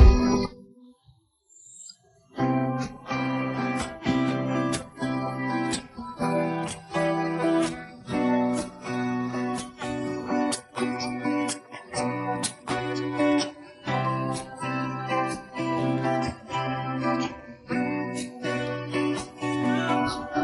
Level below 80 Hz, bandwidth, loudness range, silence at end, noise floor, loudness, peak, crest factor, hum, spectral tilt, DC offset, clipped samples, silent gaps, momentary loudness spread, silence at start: -34 dBFS; 11.5 kHz; 2 LU; 0 s; -61 dBFS; -28 LUFS; -4 dBFS; 24 dB; none; -5.5 dB/octave; under 0.1%; under 0.1%; none; 8 LU; 0 s